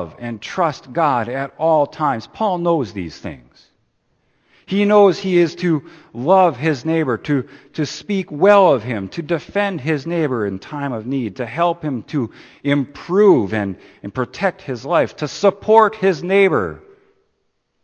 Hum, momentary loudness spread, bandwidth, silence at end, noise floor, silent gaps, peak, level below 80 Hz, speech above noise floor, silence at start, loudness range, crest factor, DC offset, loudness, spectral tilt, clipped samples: none; 13 LU; 8.6 kHz; 1.05 s; -68 dBFS; none; 0 dBFS; -56 dBFS; 50 dB; 0 s; 4 LU; 18 dB; under 0.1%; -18 LUFS; -6.5 dB/octave; under 0.1%